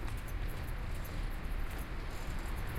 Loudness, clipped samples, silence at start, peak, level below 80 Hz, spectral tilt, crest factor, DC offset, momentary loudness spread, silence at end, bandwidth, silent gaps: -43 LUFS; under 0.1%; 0 s; -26 dBFS; -40 dBFS; -5.5 dB/octave; 12 dB; under 0.1%; 1 LU; 0 s; 16.5 kHz; none